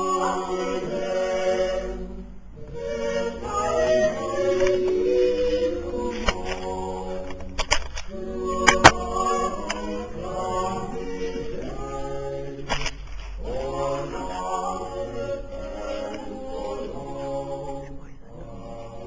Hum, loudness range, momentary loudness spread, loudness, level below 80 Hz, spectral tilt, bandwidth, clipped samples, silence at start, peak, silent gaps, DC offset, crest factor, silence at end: none; 10 LU; 14 LU; -26 LUFS; -38 dBFS; -4 dB/octave; 8 kHz; under 0.1%; 0 s; 0 dBFS; none; 0.7%; 26 dB; 0 s